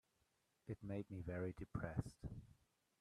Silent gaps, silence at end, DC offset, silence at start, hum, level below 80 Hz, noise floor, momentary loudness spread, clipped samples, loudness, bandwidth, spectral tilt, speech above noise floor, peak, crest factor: none; 0.45 s; under 0.1%; 0.65 s; none; -64 dBFS; -84 dBFS; 9 LU; under 0.1%; -49 LUFS; 13 kHz; -8.5 dB/octave; 35 dB; -28 dBFS; 22 dB